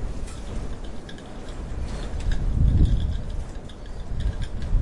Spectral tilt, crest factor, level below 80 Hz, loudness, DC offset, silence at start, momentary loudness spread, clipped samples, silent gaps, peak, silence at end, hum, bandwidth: -7 dB/octave; 18 dB; -26 dBFS; -29 LUFS; under 0.1%; 0 s; 17 LU; under 0.1%; none; -6 dBFS; 0 s; none; 11 kHz